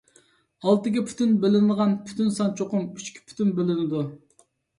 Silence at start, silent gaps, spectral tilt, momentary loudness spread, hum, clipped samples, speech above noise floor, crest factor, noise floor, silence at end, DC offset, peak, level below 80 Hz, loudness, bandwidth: 0.65 s; none; -7 dB/octave; 11 LU; none; under 0.1%; 40 dB; 18 dB; -63 dBFS; 0.6 s; under 0.1%; -6 dBFS; -66 dBFS; -24 LUFS; 11 kHz